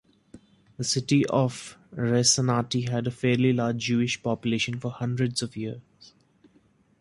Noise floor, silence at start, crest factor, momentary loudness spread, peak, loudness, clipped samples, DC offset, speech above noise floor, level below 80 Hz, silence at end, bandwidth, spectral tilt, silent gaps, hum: -62 dBFS; 0.35 s; 20 dB; 12 LU; -8 dBFS; -25 LUFS; under 0.1%; under 0.1%; 37 dB; -60 dBFS; 1.2 s; 11.5 kHz; -4.5 dB/octave; none; none